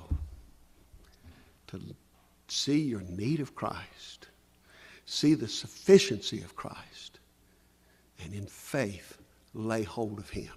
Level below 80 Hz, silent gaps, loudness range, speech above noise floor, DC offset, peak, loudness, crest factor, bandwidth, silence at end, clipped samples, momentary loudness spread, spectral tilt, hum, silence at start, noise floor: -52 dBFS; none; 10 LU; 33 dB; under 0.1%; -6 dBFS; -31 LUFS; 26 dB; 14.5 kHz; 0 s; under 0.1%; 23 LU; -5 dB/octave; 60 Hz at -60 dBFS; 0 s; -64 dBFS